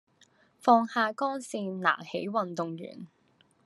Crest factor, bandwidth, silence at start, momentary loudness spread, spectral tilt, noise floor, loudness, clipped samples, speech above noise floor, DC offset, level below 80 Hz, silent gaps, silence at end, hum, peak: 22 dB; 12.5 kHz; 0.65 s; 15 LU; -5 dB/octave; -64 dBFS; -29 LUFS; under 0.1%; 36 dB; under 0.1%; -86 dBFS; none; 0.6 s; none; -8 dBFS